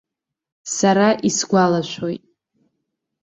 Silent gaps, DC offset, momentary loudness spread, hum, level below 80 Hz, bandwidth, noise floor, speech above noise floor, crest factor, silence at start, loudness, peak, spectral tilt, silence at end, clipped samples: none; under 0.1%; 14 LU; none; -62 dBFS; 8.4 kHz; -76 dBFS; 59 dB; 18 dB; 0.65 s; -18 LUFS; -2 dBFS; -4.5 dB/octave; 1.05 s; under 0.1%